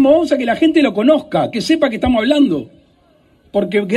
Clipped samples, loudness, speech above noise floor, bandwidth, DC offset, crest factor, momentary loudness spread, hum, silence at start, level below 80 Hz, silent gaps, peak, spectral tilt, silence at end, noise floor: under 0.1%; -15 LUFS; 39 dB; 12 kHz; under 0.1%; 14 dB; 6 LU; none; 0 s; -42 dBFS; none; -2 dBFS; -6 dB/octave; 0 s; -53 dBFS